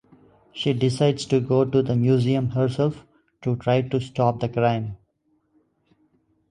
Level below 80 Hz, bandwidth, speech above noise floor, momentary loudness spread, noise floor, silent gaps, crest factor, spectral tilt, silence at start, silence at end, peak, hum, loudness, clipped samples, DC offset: -54 dBFS; 10.5 kHz; 47 dB; 8 LU; -68 dBFS; none; 18 dB; -7.5 dB/octave; 0.55 s; 1.55 s; -6 dBFS; none; -22 LUFS; under 0.1%; under 0.1%